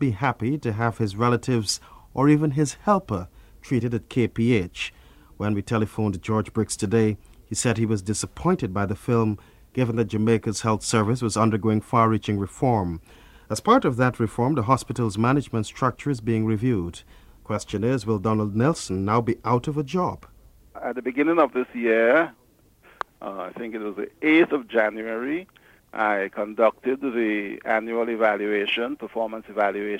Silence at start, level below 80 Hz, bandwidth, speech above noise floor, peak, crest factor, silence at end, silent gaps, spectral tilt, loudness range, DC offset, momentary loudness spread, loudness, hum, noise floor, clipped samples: 0 s; -50 dBFS; 15.5 kHz; 33 dB; -4 dBFS; 20 dB; 0 s; none; -6 dB/octave; 3 LU; under 0.1%; 11 LU; -24 LUFS; none; -56 dBFS; under 0.1%